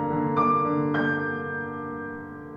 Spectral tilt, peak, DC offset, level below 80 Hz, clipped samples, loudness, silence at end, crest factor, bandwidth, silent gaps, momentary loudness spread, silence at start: -9 dB/octave; -12 dBFS; under 0.1%; -60 dBFS; under 0.1%; -26 LUFS; 0 s; 14 dB; 5.2 kHz; none; 12 LU; 0 s